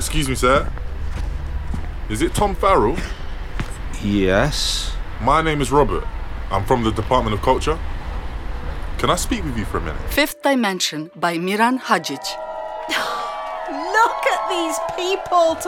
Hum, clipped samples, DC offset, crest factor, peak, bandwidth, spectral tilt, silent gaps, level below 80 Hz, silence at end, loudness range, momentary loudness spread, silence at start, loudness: none; under 0.1%; under 0.1%; 18 dB; -2 dBFS; 18.5 kHz; -4.5 dB/octave; none; -28 dBFS; 0 s; 3 LU; 13 LU; 0 s; -20 LUFS